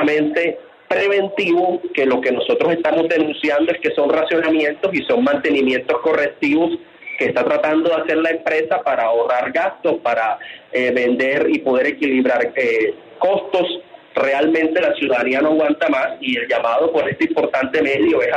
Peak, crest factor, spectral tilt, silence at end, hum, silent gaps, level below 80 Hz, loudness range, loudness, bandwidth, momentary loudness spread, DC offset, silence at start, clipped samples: -4 dBFS; 12 dB; -6 dB/octave; 0 s; none; none; -62 dBFS; 1 LU; -17 LUFS; 8.4 kHz; 4 LU; under 0.1%; 0 s; under 0.1%